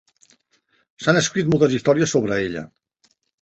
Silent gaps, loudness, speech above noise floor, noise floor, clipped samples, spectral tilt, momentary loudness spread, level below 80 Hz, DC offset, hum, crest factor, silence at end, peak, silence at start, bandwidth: none; -19 LUFS; 46 dB; -65 dBFS; under 0.1%; -5 dB/octave; 11 LU; -56 dBFS; under 0.1%; none; 18 dB; 0.75 s; -2 dBFS; 1 s; 8.4 kHz